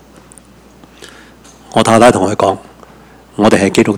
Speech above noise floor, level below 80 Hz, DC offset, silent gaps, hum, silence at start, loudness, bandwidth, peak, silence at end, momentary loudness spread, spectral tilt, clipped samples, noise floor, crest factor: 31 dB; -44 dBFS; under 0.1%; none; none; 1.75 s; -11 LUFS; 16.5 kHz; 0 dBFS; 0 s; 12 LU; -5 dB/octave; 0.7%; -41 dBFS; 14 dB